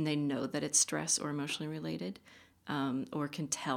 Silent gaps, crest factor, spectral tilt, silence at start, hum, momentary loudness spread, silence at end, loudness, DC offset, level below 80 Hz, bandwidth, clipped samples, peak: none; 20 dB; -3 dB/octave; 0 s; none; 12 LU; 0 s; -34 LUFS; under 0.1%; -74 dBFS; 17 kHz; under 0.1%; -16 dBFS